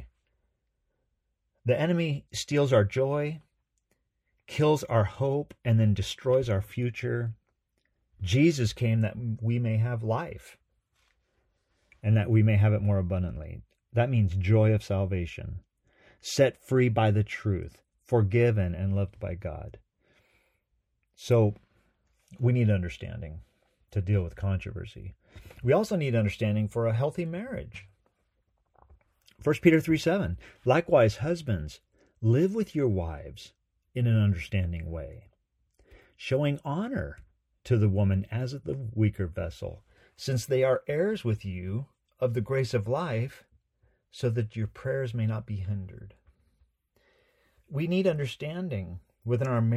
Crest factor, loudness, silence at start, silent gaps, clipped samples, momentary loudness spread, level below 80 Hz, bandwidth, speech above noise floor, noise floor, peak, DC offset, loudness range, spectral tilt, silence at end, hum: 22 dB; -28 LUFS; 0 s; none; under 0.1%; 16 LU; -52 dBFS; 13.5 kHz; 51 dB; -78 dBFS; -8 dBFS; under 0.1%; 6 LU; -7.5 dB/octave; 0 s; none